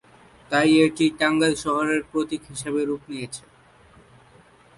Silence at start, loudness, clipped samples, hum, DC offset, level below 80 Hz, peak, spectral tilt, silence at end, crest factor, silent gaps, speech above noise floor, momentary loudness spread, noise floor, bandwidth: 0.5 s; -22 LUFS; under 0.1%; none; under 0.1%; -58 dBFS; -6 dBFS; -4.5 dB/octave; 1.4 s; 18 dB; none; 31 dB; 15 LU; -53 dBFS; 11.5 kHz